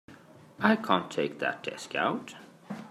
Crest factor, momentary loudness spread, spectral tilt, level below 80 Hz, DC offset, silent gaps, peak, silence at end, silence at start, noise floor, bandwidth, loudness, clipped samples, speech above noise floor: 24 dB; 17 LU; -5 dB/octave; -78 dBFS; under 0.1%; none; -8 dBFS; 0 s; 0.1 s; -53 dBFS; 13.5 kHz; -29 LUFS; under 0.1%; 24 dB